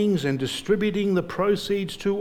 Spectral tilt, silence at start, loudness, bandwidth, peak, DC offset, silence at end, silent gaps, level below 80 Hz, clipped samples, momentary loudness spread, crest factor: -6 dB/octave; 0 s; -24 LUFS; 16 kHz; -10 dBFS; under 0.1%; 0 s; none; -52 dBFS; under 0.1%; 4 LU; 14 dB